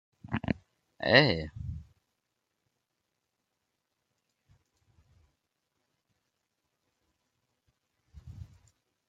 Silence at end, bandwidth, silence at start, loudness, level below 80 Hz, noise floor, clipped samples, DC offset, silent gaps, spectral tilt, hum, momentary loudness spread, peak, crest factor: 0.65 s; 7.8 kHz; 0.25 s; -28 LUFS; -58 dBFS; -83 dBFS; under 0.1%; under 0.1%; none; -6.5 dB/octave; none; 27 LU; -6 dBFS; 30 dB